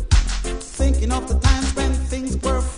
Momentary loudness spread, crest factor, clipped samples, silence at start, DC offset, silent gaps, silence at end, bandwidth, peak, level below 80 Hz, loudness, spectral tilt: 6 LU; 18 dB; under 0.1%; 0 s; under 0.1%; none; 0 s; 10.5 kHz; -2 dBFS; -20 dBFS; -21 LUFS; -5 dB/octave